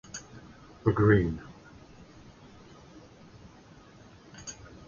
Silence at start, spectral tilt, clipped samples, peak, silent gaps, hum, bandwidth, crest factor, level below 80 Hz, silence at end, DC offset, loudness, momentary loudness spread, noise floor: 0.15 s; -7 dB/octave; under 0.1%; -8 dBFS; none; none; 7.4 kHz; 24 dB; -50 dBFS; 0.35 s; under 0.1%; -26 LUFS; 29 LU; -53 dBFS